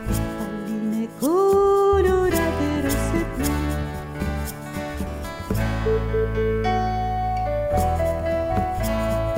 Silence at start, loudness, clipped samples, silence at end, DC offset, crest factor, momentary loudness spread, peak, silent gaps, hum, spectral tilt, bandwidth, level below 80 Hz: 0 s; -23 LUFS; under 0.1%; 0 s; under 0.1%; 14 dB; 12 LU; -8 dBFS; none; none; -6.5 dB/octave; 16 kHz; -30 dBFS